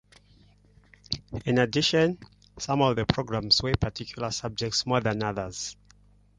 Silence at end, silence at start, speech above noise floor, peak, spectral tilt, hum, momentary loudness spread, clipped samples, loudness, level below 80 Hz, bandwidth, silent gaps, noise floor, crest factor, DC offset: 0.65 s; 1.1 s; 32 dB; -4 dBFS; -4.5 dB/octave; 50 Hz at -50 dBFS; 12 LU; under 0.1%; -26 LUFS; -48 dBFS; 10.5 kHz; none; -58 dBFS; 24 dB; under 0.1%